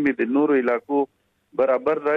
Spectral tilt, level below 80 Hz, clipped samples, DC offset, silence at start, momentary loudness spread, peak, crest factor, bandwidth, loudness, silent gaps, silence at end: -8 dB/octave; -68 dBFS; under 0.1%; under 0.1%; 0 s; 8 LU; -8 dBFS; 12 dB; 4.8 kHz; -22 LUFS; none; 0 s